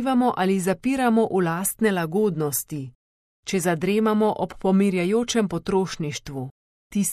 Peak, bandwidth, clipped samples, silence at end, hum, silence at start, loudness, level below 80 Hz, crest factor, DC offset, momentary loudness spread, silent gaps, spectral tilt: -8 dBFS; 14.5 kHz; under 0.1%; 0 s; none; 0 s; -23 LUFS; -54 dBFS; 16 dB; under 0.1%; 12 LU; 2.95-3.43 s, 6.51-6.90 s; -5 dB/octave